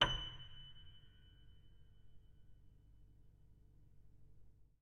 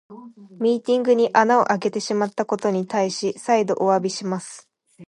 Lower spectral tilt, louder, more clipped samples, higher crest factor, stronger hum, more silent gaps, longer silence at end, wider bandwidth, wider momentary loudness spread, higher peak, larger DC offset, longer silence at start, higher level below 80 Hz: second, -3 dB/octave vs -5 dB/octave; second, -44 LUFS vs -21 LUFS; neither; first, 32 dB vs 20 dB; neither; neither; first, 0.2 s vs 0.05 s; second, 9.4 kHz vs 11.5 kHz; first, 21 LU vs 9 LU; second, -18 dBFS vs -2 dBFS; neither; about the same, 0 s vs 0.1 s; first, -58 dBFS vs -74 dBFS